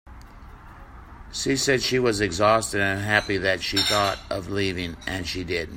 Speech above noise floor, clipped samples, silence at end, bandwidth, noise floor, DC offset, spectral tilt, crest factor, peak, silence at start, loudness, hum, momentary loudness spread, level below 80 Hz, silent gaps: 20 dB; under 0.1%; 0 s; 16.5 kHz; -44 dBFS; under 0.1%; -3.5 dB/octave; 22 dB; -2 dBFS; 0.05 s; -23 LUFS; none; 9 LU; -46 dBFS; none